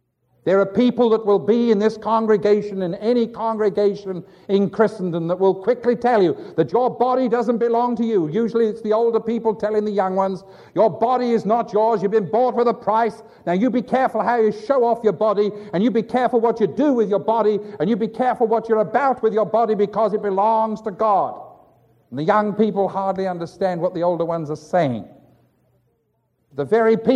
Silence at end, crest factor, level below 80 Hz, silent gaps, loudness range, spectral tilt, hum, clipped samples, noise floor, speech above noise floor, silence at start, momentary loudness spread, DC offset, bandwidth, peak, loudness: 0 s; 16 dB; -64 dBFS; none; 3 LU; -8 dB/octave; none; under 0.1%; -68 dBFS; 49 dB; 0.45 s; 7 LU; under 0.1%; 7.6 kHz; -4 dBFS; -19 LUFS